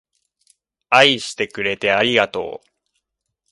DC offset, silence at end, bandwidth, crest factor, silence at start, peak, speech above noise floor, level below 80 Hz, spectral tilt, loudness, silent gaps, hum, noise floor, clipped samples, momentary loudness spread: under 0.1%; 0.95 s; 11.5 kHz; 20 dB; 0.9 s; 0 dBFS; 59 dB; -60 dBFS; -3 dB/octave; -17 LUFS; none; none; -77 dBFS; under 0.1%; 16 LU